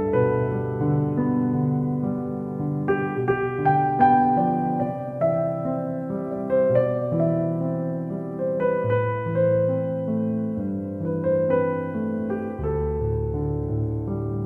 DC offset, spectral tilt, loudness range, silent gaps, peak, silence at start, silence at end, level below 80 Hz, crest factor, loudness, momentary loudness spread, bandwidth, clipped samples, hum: under 0.1%; -11 dB/octave; 3 LU; none; -6 dBFS; 0 s; 0 s; -44 dBFS; 16 dB; -24 LUFS; 7 LU; 4.2 kHz; under 0.1%; none